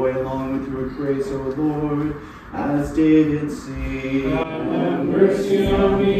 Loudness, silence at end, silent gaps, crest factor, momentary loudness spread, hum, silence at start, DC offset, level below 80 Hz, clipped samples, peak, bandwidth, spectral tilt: -21 LUFS; 0 s; none; 16 dB; 11 LU; none; 0 s; under 0.1%; -38 dBFS; under 0.1%; -2 dBFS; 13.5 kHz; -7.5 dB/octave